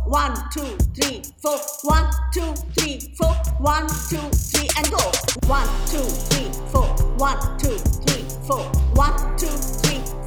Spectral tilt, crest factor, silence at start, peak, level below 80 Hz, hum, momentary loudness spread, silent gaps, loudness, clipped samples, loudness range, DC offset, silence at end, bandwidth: -4 dB/octave; 16 dB; 0 s; -4 dBFS; -22 dBFS; none; 6 LU; none; -22 LUFS; under 0.1%; 2 LU; under 0.1%; 0 s; over 20 kHz